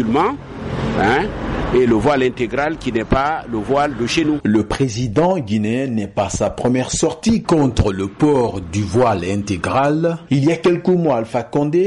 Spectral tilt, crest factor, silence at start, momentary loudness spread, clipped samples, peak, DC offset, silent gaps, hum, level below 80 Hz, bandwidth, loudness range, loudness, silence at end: -6 dB/octave; 10 dB; 0 s; 6 LU; under 0.1%; -6 dBFS; under 0.1%; none; none; -36 dBFS; 11.5 kHz; 1 LU; -18 LUFS; 0 s